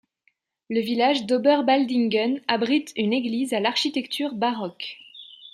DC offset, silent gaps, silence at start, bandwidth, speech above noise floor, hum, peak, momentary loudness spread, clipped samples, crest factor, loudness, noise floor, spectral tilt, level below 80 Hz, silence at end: under 0.1%; none; 0.7 s; 14.5 kHz; 46 dB; none; -4 dBFS; 13 LU; under 0.1%; 20 dB; -23 LUFS; -69 dBFS; -4.5 dB/octave; -74 dBFS; 0.05 s